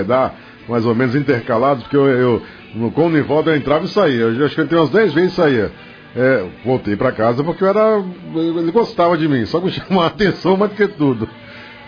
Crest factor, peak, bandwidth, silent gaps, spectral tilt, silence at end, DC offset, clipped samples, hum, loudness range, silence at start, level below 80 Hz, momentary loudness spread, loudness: 14 dB; -2 dBFS; 5.4 kHz; none; -8 dB/octave; 0 s; under 0.1%; under 0.1%; none; 2 LU; 0 s; -48 dBFS; 8 LU; -16 LUFS